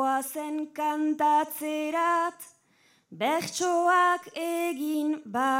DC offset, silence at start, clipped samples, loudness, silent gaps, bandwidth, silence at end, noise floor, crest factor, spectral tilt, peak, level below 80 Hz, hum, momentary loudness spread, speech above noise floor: under 0.1%; 0 s; under 0.1%; -27 LUFS; none; 16.5 kHz; 0 s; -65 dBFS; 16 dB; -3 dB/octave; -12 dBFS; -86 dBFS; none; 10 LU; 38 dB